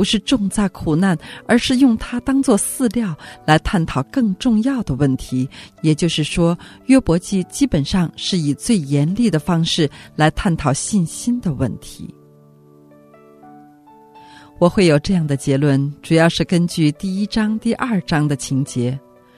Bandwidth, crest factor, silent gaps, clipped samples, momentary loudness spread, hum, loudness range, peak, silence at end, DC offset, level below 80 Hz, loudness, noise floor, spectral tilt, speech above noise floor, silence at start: 14 kHz; 18 dB; none; under 0.1%; 8 LU; none; 5 LU; 0 dBFS; 0.4 s; under 0.1%; -38 dBFS; -18 LUFS; -47 dBFS; -5.5 dB/octave; 30 dB; 0 s